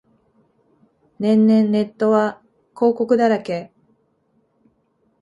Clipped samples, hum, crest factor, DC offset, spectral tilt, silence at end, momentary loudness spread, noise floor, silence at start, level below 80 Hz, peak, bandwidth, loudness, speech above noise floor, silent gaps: under 0.1%; none; 16 dB; under 0.1%; -8 dB/octave; 1.55 s; 10 LU; -64 dBFS; 1.2 s; -68 dBFS; -4 dBFS; 7.6 kHz; -18 LUFS; 48 dB; none